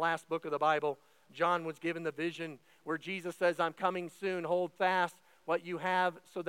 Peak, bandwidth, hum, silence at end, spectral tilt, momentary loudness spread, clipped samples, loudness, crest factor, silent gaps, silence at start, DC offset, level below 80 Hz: -16 dBFS; 16.5 kHz; none; 0 s; -5 dB/octave; 9 LU; under 0.1%; -34 LUFS; 18 dB; none; 0 s; under 0.1%; under -90 dBFS